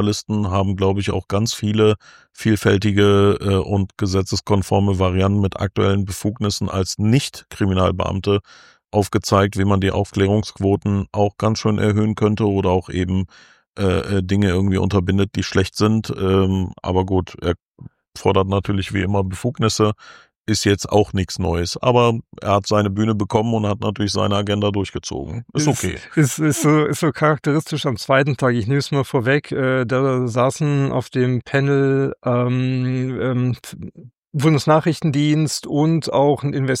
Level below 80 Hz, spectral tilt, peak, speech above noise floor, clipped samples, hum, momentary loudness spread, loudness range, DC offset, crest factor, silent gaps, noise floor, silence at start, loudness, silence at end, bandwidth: -44 dBFS; -6 dB/octave; -2 dBFS; 25 dB; under 0.1%; none; 6 LU; 2 LU; under 0.1%; 16 dB; 13.68-13.73 s, 17.62-17.66 s, 20.41-20.45 s, 34.18-34.22 s; -43 dBFS; 0 s; -19 LUFS; 0 s; 15.5 kHz